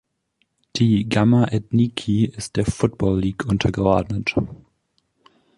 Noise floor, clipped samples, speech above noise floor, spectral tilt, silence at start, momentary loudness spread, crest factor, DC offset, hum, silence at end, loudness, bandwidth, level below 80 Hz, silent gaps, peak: -70 dBFS; under 0.1%; 50 dB; -6.5 dB/octave; 0.75 s; 7 LU; 18 dB; under 0.1%; none; 1 s; -20 LUFS; 11.5 kHz; -40 dBFS; none; -4 dBFS